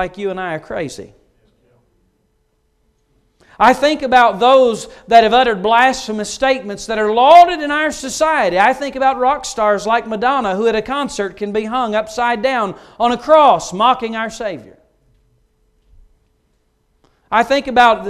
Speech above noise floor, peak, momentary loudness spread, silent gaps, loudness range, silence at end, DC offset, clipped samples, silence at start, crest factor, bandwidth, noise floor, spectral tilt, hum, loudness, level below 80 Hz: 48 dB; 0 dBFS; 13 LU; none; 11 LU; 0 s; under 0.1%; 0.1%; 0 s; 16 dB; 13.5 kHz; -62 dBFS; -3.5 dB/octave; none; -14 LUFS; -46 dBFS